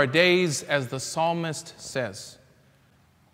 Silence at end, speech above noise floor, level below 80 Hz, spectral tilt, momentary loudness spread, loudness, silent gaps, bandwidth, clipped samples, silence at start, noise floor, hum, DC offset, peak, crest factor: 1 s; 35 dB; -68 dBFS; -4 dB/octave; 16 LU; -25 LUFS; none; 16 kHz; under 0.1%; 0 s; -60 dBFS; none; under 0.1%; -6 dBFS; 20 dB